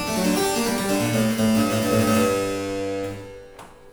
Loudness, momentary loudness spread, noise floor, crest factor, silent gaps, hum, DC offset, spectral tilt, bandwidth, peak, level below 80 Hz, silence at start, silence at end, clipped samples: -22 LUFS; 12 LU; -43 dBFS; 16 dB; none; none; under 0.1%; -4.5 dB/octave; over 20 kHz; -8 dBFS; -48 dBFS; 0 s; 0 s; under 0.1%